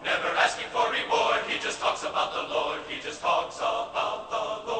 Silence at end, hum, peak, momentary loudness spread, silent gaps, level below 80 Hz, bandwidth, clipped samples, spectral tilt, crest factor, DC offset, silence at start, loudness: 0 s; none; -8 dBFS; 7 LU; none; -62 dBFS; 8.8 kHz; under 0.1%; -1.5 dB/octave; 20 dB; under 0.1%; 0 s; -27 LUFS